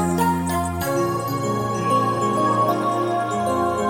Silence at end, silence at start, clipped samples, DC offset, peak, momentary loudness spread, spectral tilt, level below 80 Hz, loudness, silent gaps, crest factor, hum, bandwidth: 0 s; 0 s; under 0.1%; under 0.1%; -8 dBFS; 4 LU; -6 dB/octave; -48 dBFS; -21 LUFS; none; 12 dB; none; 17 kHz